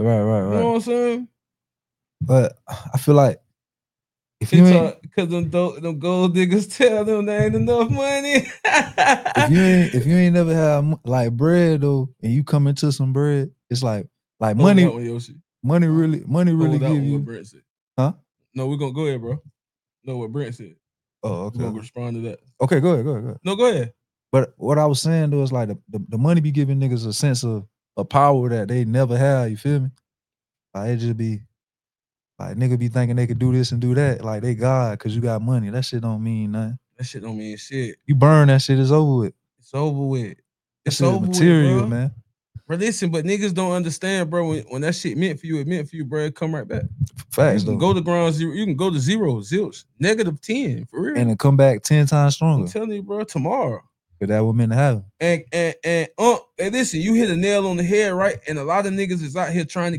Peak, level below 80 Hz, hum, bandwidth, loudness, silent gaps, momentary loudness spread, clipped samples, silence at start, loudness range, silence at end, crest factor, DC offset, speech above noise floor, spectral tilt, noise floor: 0 dBFS; -56 dBFS; none; 13.5 kHz; -20 LUFS; 17.70-17.91 s; 13 LU; under 0.1%; 0 s; 7 LU; 0 s; 18 dB; under 0.1%; over 71 dB; -6.5 dB/octave; under -90 dBFS